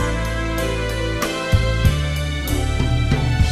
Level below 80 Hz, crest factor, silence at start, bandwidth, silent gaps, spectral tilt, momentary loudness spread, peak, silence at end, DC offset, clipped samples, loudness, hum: -24 dBFS; 16 dB; 0 s; 14 kHz; none; -5.5 dB/octave; 4 LU; -4 dBFS; 0 s; under 0.1%; under 0.1%; -20 LUFS; none